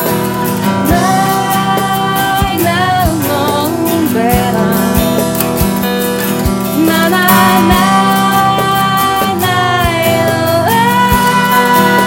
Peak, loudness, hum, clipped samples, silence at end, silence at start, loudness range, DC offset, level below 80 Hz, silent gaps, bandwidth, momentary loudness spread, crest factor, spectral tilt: 0 dBFS; -11 LUFS; none; under 0.1%; 0 s; 0 s; 3 LU; 0.1%; -28 dBFS; none; over 20 kHz; 5 LU; 10 dB; -4.5 dB/octave